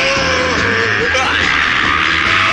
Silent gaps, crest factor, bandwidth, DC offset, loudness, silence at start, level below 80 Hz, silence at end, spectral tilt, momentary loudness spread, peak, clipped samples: none; 12 dB; 11.5 kHz; under 0.1%; -12 LUFS; 0 s; -34 dBFS; 0 s; -3 dB/octave; 2 LU; -2 dBFS; under 0.1%